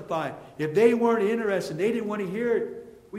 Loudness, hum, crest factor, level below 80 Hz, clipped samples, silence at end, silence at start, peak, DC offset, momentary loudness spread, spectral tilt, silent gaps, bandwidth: -25 LUFS; none; 18 dB; -66 dBFS; under 0.1%; 0 s; 0 s; -6 dBFS; under 0.1%; 13 LU; -6.5 dB/octave; none; 14.5 kHz